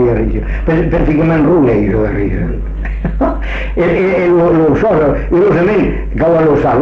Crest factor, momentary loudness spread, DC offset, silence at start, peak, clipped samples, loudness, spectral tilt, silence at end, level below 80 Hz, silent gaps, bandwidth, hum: 8 dB; 9 LU; under 0.1%; 0 s; -2 dBFS; under 0.1%; -12 LUFS; -9.5 dB/octave; 0 s; -20 dBFS; none; 6.6 kHz; none